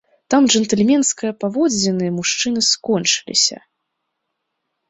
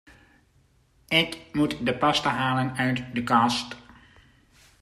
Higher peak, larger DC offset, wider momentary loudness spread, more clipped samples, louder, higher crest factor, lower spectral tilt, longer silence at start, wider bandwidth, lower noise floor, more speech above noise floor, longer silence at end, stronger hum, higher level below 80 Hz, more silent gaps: first, -2 dBFS vs -8 dBFS; neither; about the same, 5 LU vs 7 LU; neither; first, -16 LUFS vs -24 LUFS; about the same, 16 dB vs 20 dB; second, -3 dB/octave vs -4.5 dB/octave; second, 0.3 s vs 1.1 s; second, 8.4 kHz vs 15 kHz; first, -76 dBFS vs -63 dBFS; first, 58 dB vs 38 dB; first, 1.35 s vs 1 s; neither; about the same, -60 dBFS vs -56 dBFS; neither